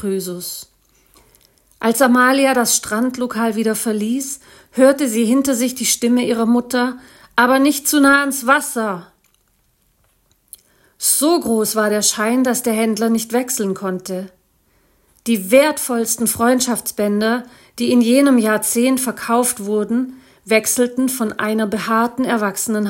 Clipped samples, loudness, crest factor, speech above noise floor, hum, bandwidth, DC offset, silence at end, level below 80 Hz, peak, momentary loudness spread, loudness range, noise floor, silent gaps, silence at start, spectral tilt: under 0.1%; -16 LUFS; 18 dB; 45 dB; none; 17 kHz; under 0.1%; 0 s; -60 dBFS; 0 dBFS; 11 LU; 3 LU; -61 dBFS; none; 0 s; -3 dB/octave